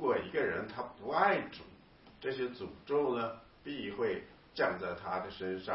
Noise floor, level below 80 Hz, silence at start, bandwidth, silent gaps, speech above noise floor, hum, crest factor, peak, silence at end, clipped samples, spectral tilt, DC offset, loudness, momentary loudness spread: -58 dBFS; -66 dBFS; 0 s; 5.6 kHz; none; 22 dB; none; 20 dB; -16 dBFS; 0 s; under 0.1%; -3 dB/octave; under 0.1%; -36 LUFS; 14 LU